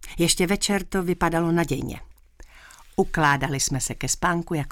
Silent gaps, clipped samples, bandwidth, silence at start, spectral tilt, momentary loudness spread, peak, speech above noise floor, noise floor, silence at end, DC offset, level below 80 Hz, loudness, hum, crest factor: none; under 0.1%; 17.5 kHz; 0 s; -4 dB/octave; 7 LU; -6 dBFS; 25 dB; -48 dBFS; 0 s; under 0.1%; -40 dBFS; -23 LUFS; none; 18 dB